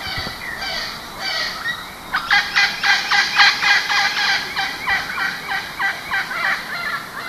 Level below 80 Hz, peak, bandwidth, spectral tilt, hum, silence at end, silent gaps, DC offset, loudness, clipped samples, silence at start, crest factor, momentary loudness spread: -48 dBFS; 0 dBFS; 14 kHz; -0.5 dB/octave; none; 0 s; none; under 0.1%; -18 LUFS; under 0.1%; 0 s; 20 dB; 12 LU